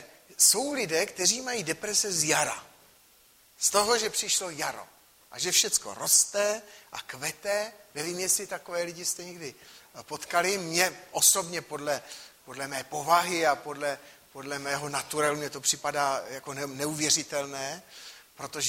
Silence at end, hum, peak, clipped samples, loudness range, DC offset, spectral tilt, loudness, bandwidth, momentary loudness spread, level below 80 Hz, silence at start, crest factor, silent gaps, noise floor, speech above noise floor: 0 s; none; -6 dBFS; under 0.1%; 5 LU; under 0.1%; -1 dB/octave; -27 LUFS; 16 kHz; 20 LU; -70 dBFS; 0 s; 24 dB; none; -60 dBFS; 31 dB